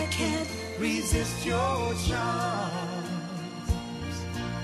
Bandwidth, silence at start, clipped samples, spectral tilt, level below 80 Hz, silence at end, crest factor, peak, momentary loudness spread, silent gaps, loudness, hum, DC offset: 13 kHz; 0 s; under 0.1%; -4.5 dB/octave; -40 dBFS; 0 s; 16 dB; -12 dBFS; 8 LU; none; -30 LUFS; none; under 0.1%